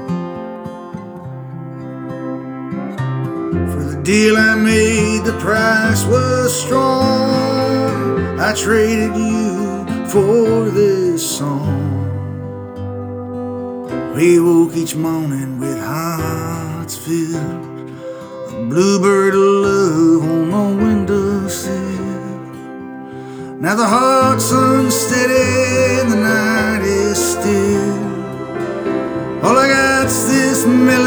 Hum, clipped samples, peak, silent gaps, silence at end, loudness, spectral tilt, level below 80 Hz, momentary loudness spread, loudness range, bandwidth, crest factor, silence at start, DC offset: none; under 0.1%; -2 dBFS; none; 0 s; -15 LUFS; -5 dB/octave; -44 dBFS; 16 LU; 7 LU; over 20 kHz; 14 dB; 0 s; under 0.1%